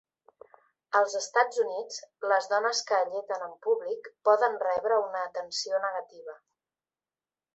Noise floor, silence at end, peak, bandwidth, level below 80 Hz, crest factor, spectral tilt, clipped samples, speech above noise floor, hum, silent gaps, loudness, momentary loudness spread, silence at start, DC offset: under -90 dBFS; 1.2 s; -8 dBFS; 8.2 kHz; -80 dBFS; 20 dB; 0 dB/octave; under 0.1%; over 62 dB; none; none; -28 LUFS; 11 LU; 0.9 s; under 0.1%